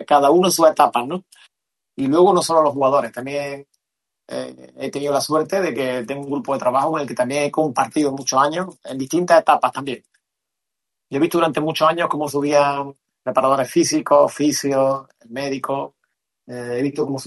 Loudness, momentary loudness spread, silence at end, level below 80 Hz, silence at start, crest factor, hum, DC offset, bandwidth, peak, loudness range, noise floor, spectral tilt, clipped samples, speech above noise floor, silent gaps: -19 LUFS; 16 LU; 0 s; -66 dBFS; 0 s; 18 dB; none; under 0.1%; 12.5 kHz; 0 dBFS; 4 LU; -83 dBFS; -4.5 dB/octave; under 0.1%; 65 dB; none